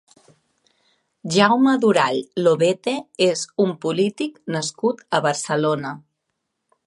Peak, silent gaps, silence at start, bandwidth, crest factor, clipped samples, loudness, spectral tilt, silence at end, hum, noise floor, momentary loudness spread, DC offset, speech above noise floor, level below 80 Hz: -2 dBFS; none; 1.25 s; 11.5 kHz; 20 dB; under 0.1%; -20 LUFS; -4.5 dB/octave; 0.85 s; none; -77 dBFS; 10 LU; under 0.1%; 57 dB; -70 dBFS